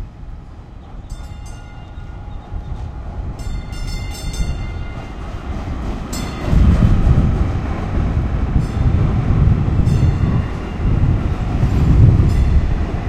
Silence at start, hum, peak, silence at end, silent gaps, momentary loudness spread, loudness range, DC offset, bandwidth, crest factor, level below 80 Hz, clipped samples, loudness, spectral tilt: 0 s; none; 0 dBFS; 0 s; none; 20 LU; 14 LU; under 0.1%; 13 kHz; 16 dB; -20 dBFS; under 0.1%; -18 LUFS; -7.5 dB/octave